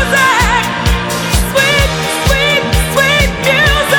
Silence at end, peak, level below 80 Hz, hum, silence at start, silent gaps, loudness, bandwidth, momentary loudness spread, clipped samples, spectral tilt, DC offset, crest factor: 0 s; 0 dBFS; -20 dBFS; none; 0 s; none; -11 LUFS; over 20 kHz; 5 LU; under 0.1%; -3.5 dB/octave; under 0.1%; 12 dB